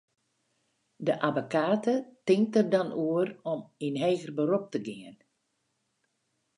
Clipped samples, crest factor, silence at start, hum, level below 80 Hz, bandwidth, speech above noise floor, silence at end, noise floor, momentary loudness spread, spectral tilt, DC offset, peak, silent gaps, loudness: under 0.1%; 20 dB; 1 s; none; -82 dBFS; 11 kHz; 49 dB; 1.45 s; -78 dBFS; 11 LU; -6.5 dB/octave; under 0.1%; -10 dBFS; none; -29 LUFS